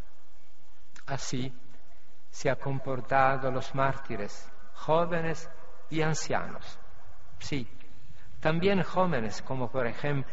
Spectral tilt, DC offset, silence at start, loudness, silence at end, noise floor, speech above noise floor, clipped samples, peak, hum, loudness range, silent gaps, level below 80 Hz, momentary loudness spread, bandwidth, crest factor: -5 dB/octave; 4%; 1.05 s; -31 LUFS; 0 s; -62 dBFS; 32 dB; under 0.1%; -10 dBFS; none; 4 LU; none; -54 dBFS; 18 LU; 8 kHz; 22 dB